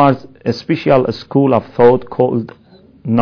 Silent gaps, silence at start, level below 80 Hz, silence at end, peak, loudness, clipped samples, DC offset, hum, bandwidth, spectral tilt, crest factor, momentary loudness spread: none; 0 s; -48 dBFS; 0 s; 0 dBFS; -14 LUFS; 0.3%; under 0.1%; none; 5.4 kHz; -8.5 dB/octave; 14 dB; 10 LU